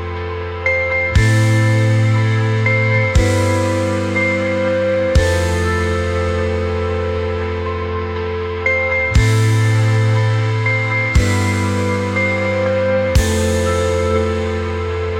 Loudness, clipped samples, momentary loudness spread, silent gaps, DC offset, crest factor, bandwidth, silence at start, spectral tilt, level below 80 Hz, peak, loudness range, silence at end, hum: -16 LUFS; under 0.1%; 7 LU; none; under 0.1%; 14 dB; 13.5 kHz; 0 s; -6 dB/octave; -28 dBFS; -2 dBFS; 3 LU; 0 s; none